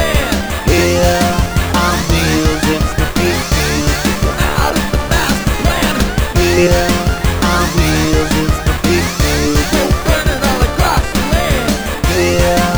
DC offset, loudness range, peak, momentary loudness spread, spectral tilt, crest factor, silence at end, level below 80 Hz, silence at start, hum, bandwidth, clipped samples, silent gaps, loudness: under 0.1%; 1 LU; 0 dBFS; 3 LU; -4.5 dB/octave; 12 dB; 0 s; -18 dBFS; 0 s; none; over 20 kHz; under 0.1%; none; -13 LUFS